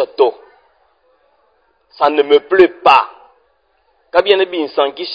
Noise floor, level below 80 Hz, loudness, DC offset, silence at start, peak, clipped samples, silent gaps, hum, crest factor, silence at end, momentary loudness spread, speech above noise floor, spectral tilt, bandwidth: -60 dBFS; -58 dBFS; -13 LUFS; under 0.1%; 0 s; 0 dBFS; 0.2%; none; none; 16 dB; 0 s; 7 LU; 47 dB; -5 dB/octave; 8 kHz